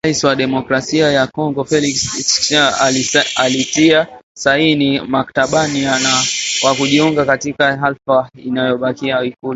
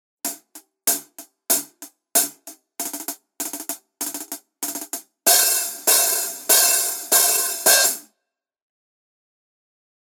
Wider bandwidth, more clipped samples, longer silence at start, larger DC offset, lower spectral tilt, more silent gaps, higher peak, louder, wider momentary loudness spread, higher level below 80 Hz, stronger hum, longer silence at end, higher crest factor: second, 8.2 kHz vs over 20 kHz; neither; second, 0.05 s vs 0.25 s; neither; first, -3 dB/octave vs 2 dB/octave; first, 4.23-4.35 s vs none; about the same, 0 dBFS vs 0 dBFS; first, -14 LUFS vs -18 LUFS; second, 6 LU vs 17 LU; first, -50 dBFS vs under -90 dBFS; neither; second, 0 s vs 2 s; second, 14 dB vs 22 dB